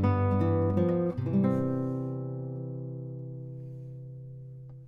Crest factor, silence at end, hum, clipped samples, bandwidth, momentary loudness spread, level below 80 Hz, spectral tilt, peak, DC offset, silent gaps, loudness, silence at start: 16 dB; 0 s; none; under 0.1%; 5.2 kHz; 17 LU; -58 dBFS; -11 dB/octave; -14 dBFS; under 0.1%; none; -30 LUFS; 0 s